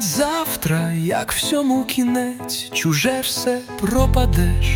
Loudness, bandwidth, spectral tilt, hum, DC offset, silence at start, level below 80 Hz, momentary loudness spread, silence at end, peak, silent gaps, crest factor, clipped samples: -20 LUFS; 19.5 kHz; -4.5 dB/octave; none; under 0.1%; 0 s; -26 dBFS; 5 LU; 0 s; -4 dBFS; none; 14 dB; under 0.1%